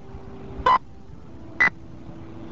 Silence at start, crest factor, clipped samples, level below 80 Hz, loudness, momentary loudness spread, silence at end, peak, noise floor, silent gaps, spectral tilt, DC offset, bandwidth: 0.1 s; 20 dB; under 0.1%; -46 dBFS; -22 LUFS; 22 LU; 0 s; -6 dBFS; -44 dBFS; none; -5 dB/octave; 0.9%; 7.6 kHz